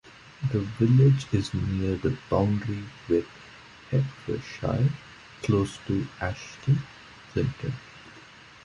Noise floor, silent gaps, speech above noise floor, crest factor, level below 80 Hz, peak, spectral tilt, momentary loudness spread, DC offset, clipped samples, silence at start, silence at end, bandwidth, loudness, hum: -49 dBFS; none; 24 dB; 20 dB; -46 dBFS; -8 dBFS; -7.5 dB/octave; 24 LU; under 0.1%; under 0.1%; 0.05 s; 0.45 s; 10.5 kHz; -27 LUFS; none